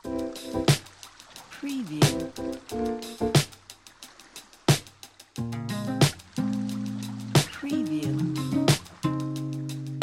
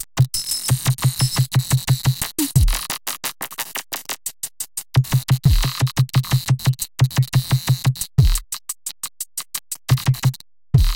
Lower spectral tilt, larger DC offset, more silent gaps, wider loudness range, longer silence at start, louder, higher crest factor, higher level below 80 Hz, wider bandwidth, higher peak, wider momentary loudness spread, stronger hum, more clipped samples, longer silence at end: about the same, -5 dB/octave vs -4.5 dB/octave; neither; neither; about the same, 2 LU vs 3 LU; about the same, 0.05 s vs 0 s; second, -28 LUFS vs -20 LUFS; about the same, 20 dB vs 16 dB; second, -52 dBFS vs -28 dBFS; about the same, 16.5 kHz vs 17.5 kHz; second, -8 dBFS vs -2 dBFS; first, 21 LU vs 10 LU; neither; neither; about the same, 0 s vs 0 s